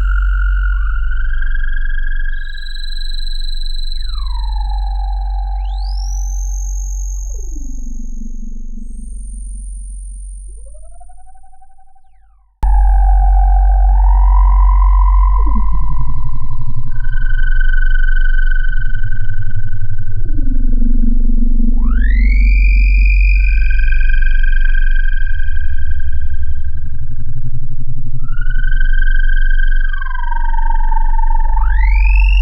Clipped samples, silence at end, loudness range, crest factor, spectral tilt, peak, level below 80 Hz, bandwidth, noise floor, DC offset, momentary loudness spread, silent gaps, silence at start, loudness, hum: under 0.1%; 0 s; 14 LU; 8 dB; -5 dB/octave; 0 dBFS; -12 dBFS; 7 kHz; -46 dBFS; under 0.1%; 16 LU; none; 0 s; -18 LUFS; none